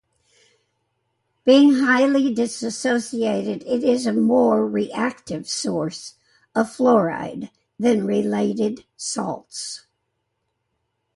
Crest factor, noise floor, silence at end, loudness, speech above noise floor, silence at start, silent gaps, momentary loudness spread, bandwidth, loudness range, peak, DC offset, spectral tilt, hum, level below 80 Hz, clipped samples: 18 dB; -75 dBFS; 1.35 s; -20 LUFS; 55 dB; 1.45 s; none; 14 LU; 11.5 kHz; 6 LU; -4 dBFS; under 0.1%; -4.5 dB/octave; none; -64 dBFS; under 0.1%